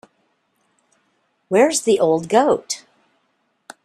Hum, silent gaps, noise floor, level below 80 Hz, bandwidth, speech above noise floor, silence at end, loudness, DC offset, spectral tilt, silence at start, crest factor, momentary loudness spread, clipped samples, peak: none; none; -68 dBFS; -66 dBFS; 13 kHz; 51 dB; 1.1 s; -18 LUFS; under 0.1%; -3.5 dB/octave; 1.5 s; 20 dB; 10 LU; under 0.1%; -2 dBFS